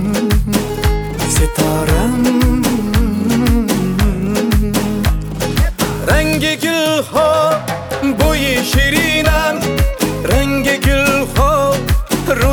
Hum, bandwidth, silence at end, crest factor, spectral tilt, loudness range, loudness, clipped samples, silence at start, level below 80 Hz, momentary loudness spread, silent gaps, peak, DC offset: none; over 20 kHz; 0 s; 14 dB; -5 dB/octave; 2 LU; -14 LUFS; under 0.1%; 0 s; -20 dBFS; 5 LU; none; 0 dBFS; under 0.1%